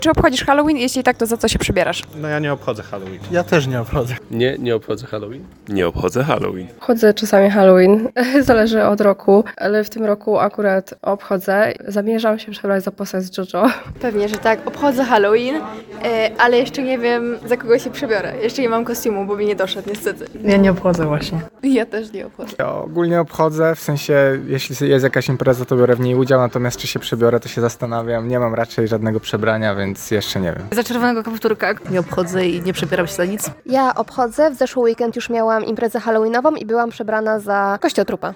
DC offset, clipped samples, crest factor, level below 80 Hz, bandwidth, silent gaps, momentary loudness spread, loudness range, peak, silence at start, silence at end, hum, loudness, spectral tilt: under 0.1%; under 0.1%; 16 dB; -42 dBFS; 18 kHz; none; 9 LU; 6 LU; 0 dBFS; 0 s; 0 s; none; -17 LUFS; -5.5 dB/octave